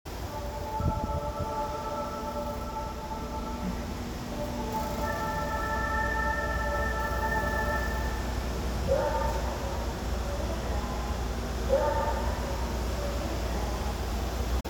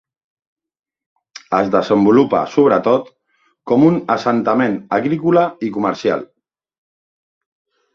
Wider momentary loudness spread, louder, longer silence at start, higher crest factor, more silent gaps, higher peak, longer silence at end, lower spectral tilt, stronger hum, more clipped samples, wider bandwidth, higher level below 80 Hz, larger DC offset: about the same, 7 LU vs 7 LU; second, -32 LUFS vs -15 LUFS; second, 0.05 s vs 1.5 s; about the same, 18 dB vs 16 dB; neither; second, -12 dBFS vs 0 dBFS; second, 0 s vs 1.7 s; second, -5.5 dB/octave vs -7.5 dB/octave; neither; neither; first, over 20 kHz vs 7.2 kHz; first, -34 dBFS vs -58 dBFS; neither